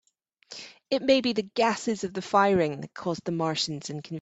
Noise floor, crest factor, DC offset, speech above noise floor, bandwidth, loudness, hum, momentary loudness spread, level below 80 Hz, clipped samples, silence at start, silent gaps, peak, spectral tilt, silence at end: -53 dBFS; 20 dB; under 0.1%; 26 dB; 8.2 kHz; -27 LUFS; none; 16 LU; -66 dBFS; under 0.1%; 0.5 s; none; -8 dBFS; -4.5 dB/octave; 0 s